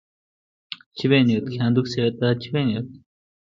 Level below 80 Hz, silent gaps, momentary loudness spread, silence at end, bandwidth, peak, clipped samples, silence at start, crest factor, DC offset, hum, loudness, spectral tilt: -60 dBFS; 0.86-0.91 s; 19 LU; 0.6 s; 7.4 kHz; -6 dBFS; under 0.1%; 0.7 s; 18 dB; under 0.1%; none; -22 LUFS; -7.5 dB/octave